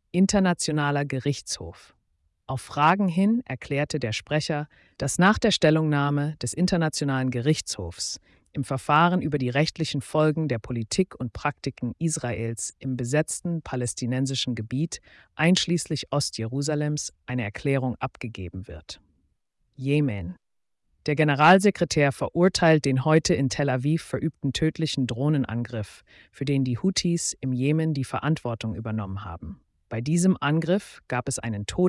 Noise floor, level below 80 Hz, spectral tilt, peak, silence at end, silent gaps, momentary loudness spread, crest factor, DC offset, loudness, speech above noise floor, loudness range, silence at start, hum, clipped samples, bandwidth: -75 dBFS; -52 dBFS; -5 dB/octave; -8 dBFS; 0 s; none; 13 LU; 18 dB; under 0.1%; -25 LUFS; 50 dB; 6 LU; 0.15 s; none; under 0.1%; 12 kHz